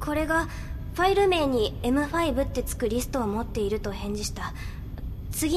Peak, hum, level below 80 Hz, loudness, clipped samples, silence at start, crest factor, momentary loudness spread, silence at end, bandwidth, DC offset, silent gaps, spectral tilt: -10 dBFS; none; -36 dBFS; -27 LUFS; under 0.1%; 0 s; 16 dB; 14 LU; 0 s; 14 kHz; under 0.1%; none; -5 dB/octave